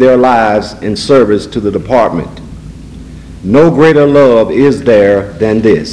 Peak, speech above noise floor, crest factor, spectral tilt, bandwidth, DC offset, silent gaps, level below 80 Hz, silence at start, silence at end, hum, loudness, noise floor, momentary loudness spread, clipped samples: 0 dBFS; 20 dB; 8 dB; -7 dB/octave; 11 kHz; under 0.1%; none; -34 dBFS; 0 s; 0 s; none; -8 LUFS; -28 dBFS; 19 LU; 2%